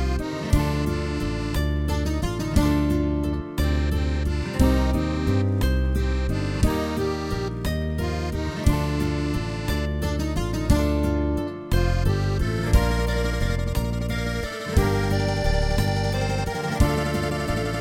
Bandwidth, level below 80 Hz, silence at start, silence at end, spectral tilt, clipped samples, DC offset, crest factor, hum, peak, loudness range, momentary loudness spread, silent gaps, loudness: 17 kHz; -26 dBFS; 0 s; 0 s; -6.5 dB/octave; under 0.1%; under 0.1%; 18 dB; none; -6 dBFS; 2 LU; 5 LU; none; -24 LUFS